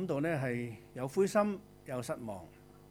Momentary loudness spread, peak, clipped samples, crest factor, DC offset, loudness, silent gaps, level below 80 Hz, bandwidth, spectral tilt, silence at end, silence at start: 15 LU; -16 dBFS; under 0.1%; 20 dB; under 0.1%; -35 LUFS; none; -66 dBFS; 19.5 kHz; -6.5 dB/octave; 0.05 s; 0 s